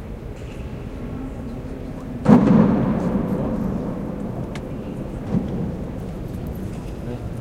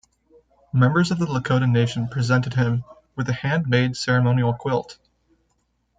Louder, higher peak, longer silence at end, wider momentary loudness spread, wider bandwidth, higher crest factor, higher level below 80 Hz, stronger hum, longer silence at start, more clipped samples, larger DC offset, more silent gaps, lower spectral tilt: about the same, -23 LUFS vs -21 LUFS; first, 0 dBFS vs -6 dBFS; second, 0 s vs 1.05 s; first, 17 LU vs 8 LU; first, 13 kHz vs 8.8 kHz; first, 22 dB vs 16 dB; first, -36 dBFS vs -54 dBFS; neither; second, 0 s vs 0.75 s; neither; neither; neither; first, -9 dB/octave vs -6.5 dB/octave